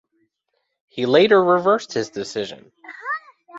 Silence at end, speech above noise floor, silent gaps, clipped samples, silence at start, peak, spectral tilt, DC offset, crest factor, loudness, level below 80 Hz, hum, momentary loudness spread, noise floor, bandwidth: 0 s; 56 dB; none; under 0.1%; 0.95 s; -2 dBFS; -5 dB/octave; under 0.1%; 18 dB; -19 LUFS; -66 dBFS; none; 19 LU; -74 dBFS; 8 kHz